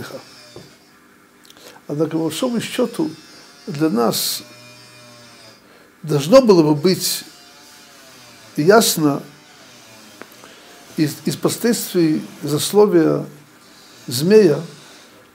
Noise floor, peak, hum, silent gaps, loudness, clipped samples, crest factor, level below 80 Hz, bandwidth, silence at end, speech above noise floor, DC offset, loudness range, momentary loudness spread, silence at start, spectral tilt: -50 dBFS; 0 dBFS; none; none; -17 LUFS; under 0.1%; 20 dB; -62 dBFS; 16.5 kHz; 0.6 s; 33 dB; under 0.1%; 7 LU; 24 LU; 0 s; -5 dB/octave